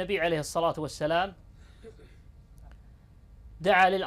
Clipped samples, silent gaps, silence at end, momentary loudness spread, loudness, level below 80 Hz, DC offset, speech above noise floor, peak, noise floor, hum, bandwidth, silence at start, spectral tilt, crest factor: under 0.1%; none; 0 s; 10 LU; -27 LUFS; -52 dBFS; under 0.1%; 27 dB; -10 dBFS; -53 dBFS; none; 15 kHz; 0 s; -4.5 dB/octave; 20 dB